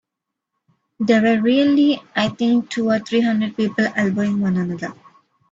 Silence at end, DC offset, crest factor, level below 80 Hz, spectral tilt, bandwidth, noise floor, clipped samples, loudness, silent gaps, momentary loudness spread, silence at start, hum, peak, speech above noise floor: 0.6 s; under 0.1%; 16 dB; -62 dBFS; -6.5 dB/octave; 7.8 kHz; -82 dBFS; under 0.1%; -18 LUFS; none; 7 LU; 1 s; none; -4 dBFS; 64 dB